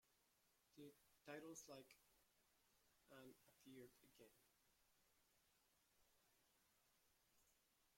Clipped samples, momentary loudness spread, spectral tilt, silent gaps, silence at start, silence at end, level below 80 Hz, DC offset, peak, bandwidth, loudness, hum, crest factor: under 0.1%; 10 LU; -3.5 dB/octave; none; 0.05 s; 0 s; under -90 dBFS; under 0.1%; -44 dBFS; 16.5 kHz; -63 LUFS; none; 26 dB